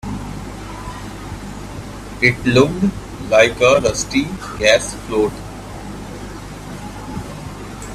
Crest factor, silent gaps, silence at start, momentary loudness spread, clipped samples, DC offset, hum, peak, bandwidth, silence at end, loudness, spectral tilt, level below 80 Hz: 20 dB; none; 0.05 s; 18 LU; under 0.1%; under 0.1%; none; 0 dBFS; 14.5 kHz; 0 s; -16 LUFS; -4.5 dB/octave; -36 dBFS